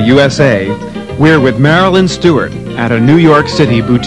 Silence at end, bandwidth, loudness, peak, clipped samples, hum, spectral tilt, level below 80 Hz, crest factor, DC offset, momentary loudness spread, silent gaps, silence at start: 0 s; 11.5 kHz; -9 LUFS; 0 dBFS; 2%; none; -6.5 dB/octave; -36 dBFS; 8 dB; 0.9%; 10 LU; none; 0 s